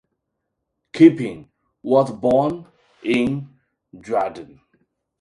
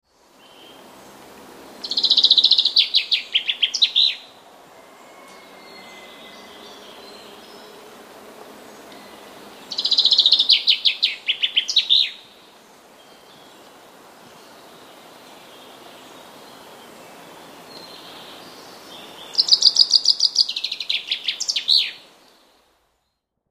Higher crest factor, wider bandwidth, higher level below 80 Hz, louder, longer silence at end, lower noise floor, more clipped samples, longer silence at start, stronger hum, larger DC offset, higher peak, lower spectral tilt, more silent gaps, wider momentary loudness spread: about the same, 20 dB vs 24 dB; second, 10.5 kHz vs 15.5 kHz; first, -58 dBFS vs -74 dBFS; second, -19 LUFS vs -16 LUFS; second, 0.75 s vs 1.55 s; about the same, -77 dBFS vs -74 dBFS; neither; second, 0.95 s vs 1.6 s; neither; neither; about the same, 0 dBFS vs 0 dBFS; first, -7.5 dB/octave vs 1.5 dB/octave; neither; second, 21 LU vs 28 LU